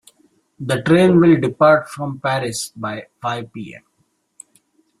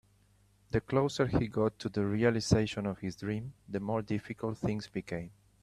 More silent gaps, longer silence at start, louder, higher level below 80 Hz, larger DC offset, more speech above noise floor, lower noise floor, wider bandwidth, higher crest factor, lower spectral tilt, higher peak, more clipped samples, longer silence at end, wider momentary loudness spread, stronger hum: neither; about the same, 0.6 s vs 0.7 s; first, -17 LUFS vs -33 LUFS; about the same, -56 dBFS vs -54 dBFS; neither; first, 49 dB vs 34 dB; about the same, -66 dBFS vs -66 dBFS; about the same, 13.5 kHz vs 13 kHz; about the same, 16 dB vs 20 dB; about the same, -6 dB/octave vs -6.5 dB/octave; first, -2 dBFS vs -12 dBFS; neither; first, 1.25 s vs 0.3 s; first, 18 LU vs 10 LU; neither